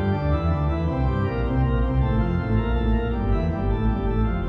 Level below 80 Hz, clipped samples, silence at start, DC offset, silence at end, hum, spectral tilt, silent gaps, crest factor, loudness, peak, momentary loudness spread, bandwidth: -26 dBFS; under 0.1%; 0 s; under 0.1%; 0 s; none; -10 dB/octave; none; 12 dB; -23 LUFS; -10 dBFS; 2 LU; 5 kHz